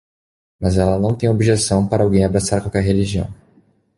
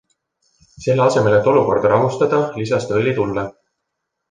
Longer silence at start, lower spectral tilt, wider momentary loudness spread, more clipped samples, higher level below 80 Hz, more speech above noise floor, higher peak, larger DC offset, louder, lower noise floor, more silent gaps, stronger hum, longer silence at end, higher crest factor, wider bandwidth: second, 0.6 s vs 0.8 s; about the same, -6 dB/octave vs -6.5 dB/octave; about the same, 7 LU vs 9 LU; neither; first, -34 dBFS vs -52 dBFS; second, 39 dB vs 61 dB; about the same, -2 dBFS vs -2 dBFS; neither; about the same, -17 LUFS vs -17 LUFS; second, -55 dBFS vs -77 dBFS; neither; neither; second, 0.65 s vs 0.8 s; about the same, 16 dB vs 16 dB; first, 11.5 kHz vs 9.4 kHz